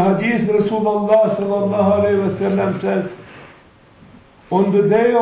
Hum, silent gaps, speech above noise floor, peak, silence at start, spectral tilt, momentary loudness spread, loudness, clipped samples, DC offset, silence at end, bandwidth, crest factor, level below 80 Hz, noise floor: none; none; 31 dB; -4 dBFS; 0 s; -11.5 dB/octave; 7 LU; -17 LUFS; under 0.1%; under 0.1%; 0 s; 4 kHz; 14 dB; -48 dBFS; -47 dBFS